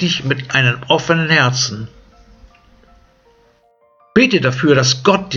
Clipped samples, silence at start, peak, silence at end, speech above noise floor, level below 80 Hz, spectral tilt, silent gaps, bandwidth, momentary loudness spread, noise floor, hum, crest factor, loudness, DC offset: under 0.1%; 0 s; 0 dBFS; 0 s; 40 dB; -50 dBFS; -4.5 dB/octave; none; 7.4 kHz; 6 LU; -55 dBFS; none; 16 dB; -14 LUFS; under 0.1%